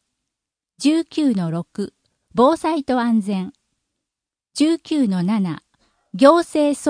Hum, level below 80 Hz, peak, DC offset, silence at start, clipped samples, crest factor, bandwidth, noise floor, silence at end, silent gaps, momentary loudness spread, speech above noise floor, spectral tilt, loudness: none; -62 dBFS; 0 dBFS; under 0.1%; 0.8 s; under 0.1%; 20 dB; 10.5 kHz; -86 dBFS; 0 s; none; 16 LU; 69 dB; -6 dB/octave; -19 LUFS